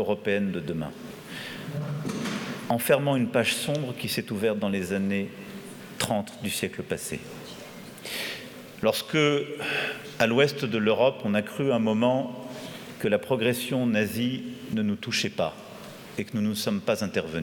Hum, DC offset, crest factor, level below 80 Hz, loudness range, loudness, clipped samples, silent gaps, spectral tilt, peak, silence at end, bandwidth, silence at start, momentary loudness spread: none; under 0.1%; 22 dB; -62 dBFS; 6 LU; -27 LUFS; under 0.1%; none; -5 dB/octave; -6 dBFS; 0 s; 19 kHz; 0 s; 15 LU